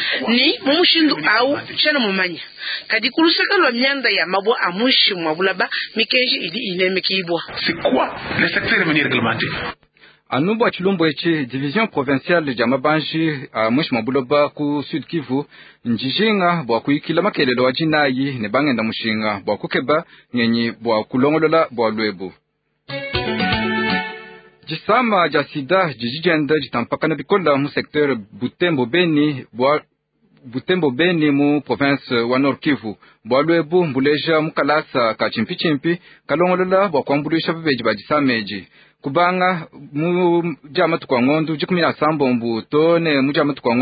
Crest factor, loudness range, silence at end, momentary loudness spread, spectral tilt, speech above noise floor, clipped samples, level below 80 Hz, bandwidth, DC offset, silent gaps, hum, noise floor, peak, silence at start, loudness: 16 dB; 3 LU; 0 s; 8 LU; -10.5 dB/octave; 41 dB; under 0.1%; -52 dBFS; 5 kHz; under 0.1%; none; none; -59 dBFS; -2 dBFS; 0 s; -18 LUFS